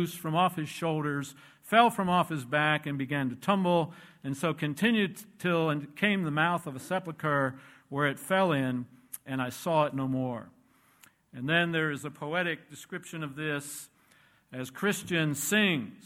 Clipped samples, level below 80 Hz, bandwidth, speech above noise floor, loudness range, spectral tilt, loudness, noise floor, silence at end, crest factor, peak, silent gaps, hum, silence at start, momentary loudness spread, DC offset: under 0.1%; -70 dBFS; 16.5 kHz; 34 dB; 5 LU; -5 dB/octave; -29 LUFS; -64 dBFS; 0.05 s; 22 dB; -8 dBFS; none; none; 0 s; 13 LU; under 0.1%